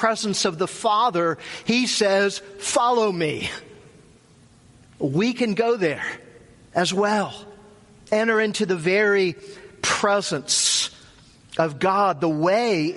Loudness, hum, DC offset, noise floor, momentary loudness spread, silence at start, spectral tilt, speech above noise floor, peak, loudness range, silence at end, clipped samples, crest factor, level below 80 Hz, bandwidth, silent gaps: -22 LUFS; none; under 0.1%; -53 dBFS; 10 LU; 0 s; -3.5 dB/octave; 31 dB; -6 dBFS; 4 LU; 0 s; under 0.1%; 18 dB; -60 dBFS; 11.5 kHz; none